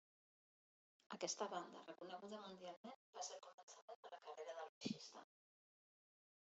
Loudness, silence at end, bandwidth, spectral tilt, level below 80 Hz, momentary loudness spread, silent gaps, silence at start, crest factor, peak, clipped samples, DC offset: -53 LUFS; 1.3 s; 8 kHz; -3 dB/octave; under -90 dBFS; 13 LU; 2.77-2.84 s, 2.96-3.13 s, 3.54-3.68 s, 3.82-3.88 s, 3.96-4.03 s, 4.69-4.81 s; 1.1 s; 24 dB; -32 dBFS; under 0.1%; under 0.1%